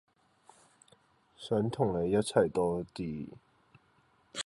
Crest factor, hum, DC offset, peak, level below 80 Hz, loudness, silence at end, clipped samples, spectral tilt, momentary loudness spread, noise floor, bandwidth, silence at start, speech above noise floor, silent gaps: 24 dB; none; under 0.1%; -10 dBFS; -60 dBFS; -32 LUFS; 0.05 s; under 0.1%; -6 dB/octave; 16 LU; -68 dBFS; 11.5 kHz; 1.4 s; 38 dB; none